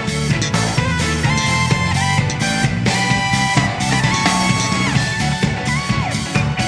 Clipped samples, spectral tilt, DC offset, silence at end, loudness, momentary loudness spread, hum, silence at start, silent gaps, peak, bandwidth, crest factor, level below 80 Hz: under 0.1%; -4 dB/octave; under 0.1%; 0 s; -17 LUFS; 4 LU; none; 0 s; none; 0 dBFS; 11 kHz; 16 dB; -34 dBFS